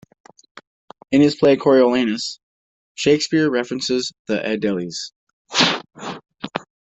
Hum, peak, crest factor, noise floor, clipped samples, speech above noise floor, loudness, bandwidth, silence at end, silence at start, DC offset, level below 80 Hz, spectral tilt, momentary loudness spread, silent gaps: none; -2 dBFS; 18 dB; under -90 dBFS; under 0.1%; over 72 dB; -18 LUFS; 8.4 kHz; 0.25 s; 1.1 s; under 0.1%; -60 dBFS; -4.5 dB/octave; 18 LU; 2.43-2.95 s, 4.19-4.25 s, 5.16-5.27 s, 5.33-5.45 s